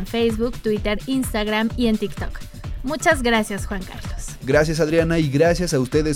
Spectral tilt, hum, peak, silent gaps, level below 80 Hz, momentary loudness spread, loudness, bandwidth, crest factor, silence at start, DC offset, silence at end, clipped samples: -5.5 dB/octave; none; -4 dBFS; none; -32 dBFS; 14 LU; -21 LUFS; 17.5 kHz; 16 dB; 0 s; under 0.1%; 0 s; under 0.1%